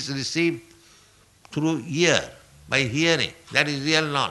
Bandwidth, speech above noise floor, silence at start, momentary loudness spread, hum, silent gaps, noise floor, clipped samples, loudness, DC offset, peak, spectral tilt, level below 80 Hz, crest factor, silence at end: 12 kHz; 33 dB; 0 s; 7 LU; none; none; -56 dBFS; under 0.1%; -22 LUFS; under 0.1%; -2 dBFS; -3.5 dB/octave; -58 dBFS; 22 dB; 0 s